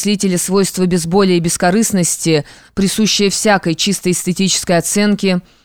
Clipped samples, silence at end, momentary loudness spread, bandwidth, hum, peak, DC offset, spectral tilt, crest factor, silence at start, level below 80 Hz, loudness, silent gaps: under 0.1%; 0.25 s; 4 LU; 18.5 kHz; none; -2 dBFS; 0.6%; -4 dB/octave; 12 dB; 0 s; -44 dBFS; -14 LUFS; none